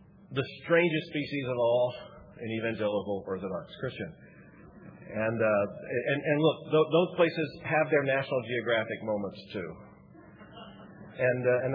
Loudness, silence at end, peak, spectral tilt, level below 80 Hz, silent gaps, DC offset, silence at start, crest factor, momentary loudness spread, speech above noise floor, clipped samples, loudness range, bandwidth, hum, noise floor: -29 LUFS; 0 s; -12 dBFS; -9 dB/octave; -66 dBFS; none; under 0.1%; 0.25 s; 18 dB; 18 LU; 24 dB; under 0.1%; 6 LU; 5.2 kHz; none; -53 dBFS